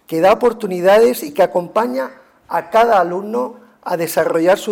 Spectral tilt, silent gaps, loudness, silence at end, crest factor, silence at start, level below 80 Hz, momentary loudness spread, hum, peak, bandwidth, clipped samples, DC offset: -5 dB/octave; none; -16 LUFS; 0 s; 12 dB; 0.1 s; -54 dBFS; 12 LU; none; -4 dBFS; 18 kHz; under 0.1%; under 0.1%